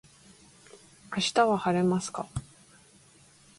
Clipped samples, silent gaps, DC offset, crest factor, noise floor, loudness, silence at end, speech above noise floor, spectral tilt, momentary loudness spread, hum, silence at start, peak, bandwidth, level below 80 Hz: under 0.1%; none; under 0.1%; 22 dB; -58 dBFS; -28 LUFS; 1.2 s; 31 dB; -5 dB/octave; 13 LU; none; 0.75 s; -10 dBFS; 11.5 kHz; -56 dBFS